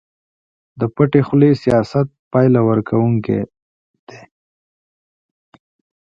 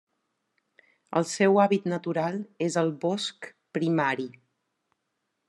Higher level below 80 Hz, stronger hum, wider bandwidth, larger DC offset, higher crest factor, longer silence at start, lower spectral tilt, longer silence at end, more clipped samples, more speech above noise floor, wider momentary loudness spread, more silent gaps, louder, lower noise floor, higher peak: first, -50 dBFS vs -78 dBFS; neither; second, 7.6 kHz vs 12 kHz; neither; about the same, 18 dB vs 20 dB; second, 0.75 s vs 1.1 s; first, -9.5 dB/octave vs -5.5 dB/octave; first, 1.85 s vs 1.2 s; neither; first, over 76 dB vs 54 dB; second, 9 LU vs 12 LU; first, 2.19-2.31 s, 3.62-4.07 s vs none; first, -16 LUFS vs -27 LUFS; first, under -90 dBFS vs -80 dBFS; first, 0 dBFS vs -8 dBFS